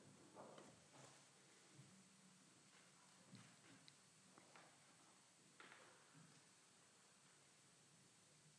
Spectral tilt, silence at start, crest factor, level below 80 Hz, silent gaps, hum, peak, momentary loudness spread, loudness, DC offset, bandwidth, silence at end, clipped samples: -3 dB/octave; 0 s; 22 dB; under -90 dBFS; none; none; -46 dBFS; 5 LU; -67 LUFS; under 0.1%; 11 kHz; 0 s; under 0.1%